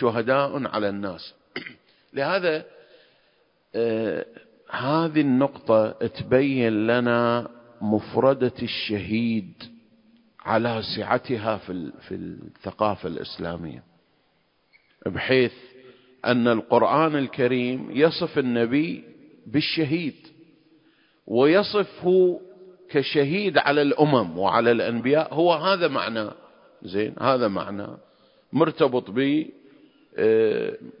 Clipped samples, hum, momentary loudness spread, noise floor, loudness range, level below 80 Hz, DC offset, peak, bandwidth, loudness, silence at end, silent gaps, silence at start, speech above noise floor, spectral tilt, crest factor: under 0.1%; none; 15 LU; -67 dBFS; 7 LU; -60 dBFS; under 0.1%; -2 dBFS; 5.4 kHz; -23 LUFS; 0.1 s; none; 0 s; 44 dB; -10.5 dB/octave; 22 dB